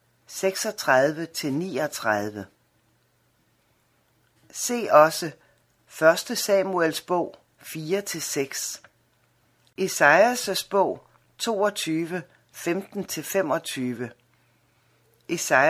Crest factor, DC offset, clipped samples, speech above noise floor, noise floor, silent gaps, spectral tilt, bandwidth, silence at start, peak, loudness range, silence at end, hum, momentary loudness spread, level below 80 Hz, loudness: 24 dB; under 0.1%; under 0.1%; 43 dB; -66 dBFS; none; -3.5 dB/octave; 16 kHz; 0.3 s; -2 dBFS; 7 LU; 0 s; none; 18 LU; -72 dBFS; -24 LUFS